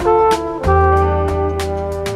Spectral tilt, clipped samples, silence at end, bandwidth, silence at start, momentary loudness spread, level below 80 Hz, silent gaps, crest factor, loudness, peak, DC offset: -6.5 dB/octave; under 0.1%; 0 s; 14 kHz; 0 s; 8 LU; -24 dBFS; none; 12 dB; -16 LUFS; -2 dBFS; under 0.1%